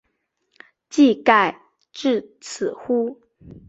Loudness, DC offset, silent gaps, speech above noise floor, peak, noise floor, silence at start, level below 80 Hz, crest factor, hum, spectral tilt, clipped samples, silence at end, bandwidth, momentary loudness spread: -20 LUFS; under 0.1%; none; 53 dB; -2 dBFS; -73 dBFS; 0.95 s; -62 dBFS; 20 dB; none; -4 dB/octave; under 0.1%; 0.55 s; 8 kHz; 13 LU